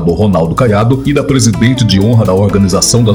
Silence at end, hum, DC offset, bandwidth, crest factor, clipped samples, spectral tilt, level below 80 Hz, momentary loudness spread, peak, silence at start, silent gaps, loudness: 0 s; none; under 0.1%; 20 kHz; 8 dB; 0.9%; -5.5 dB/octave; -28 dBFS; 2 LU; 0 dBFS; 0 s; none; -9 LUFS